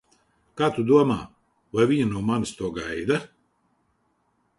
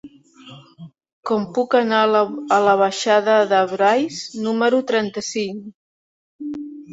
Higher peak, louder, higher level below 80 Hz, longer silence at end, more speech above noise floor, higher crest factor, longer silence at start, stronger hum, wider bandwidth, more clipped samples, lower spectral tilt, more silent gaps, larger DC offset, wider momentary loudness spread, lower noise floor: second, -6 dBFS vs -2 dBFS; second, -24 LUFS vs -18 LUFS; first, -54 dBFS vs -68 dBFS; first, 1.3 s vs 0 s; first, 47 dB vs 26 dB; about the same, 20 dB vs 16 dB; first, 0.55 s vs 0.05 s; neither; first, 11.5 kHz vs 8 kHz; neither; first, -6.5 dB/octave vs -4 dB/octave; second, none vs 1.13-1.23 s, 5.74-6.39 s; neither; second, 11 LU vs 15 LU; first, -70 dBFS vs -44 dBFS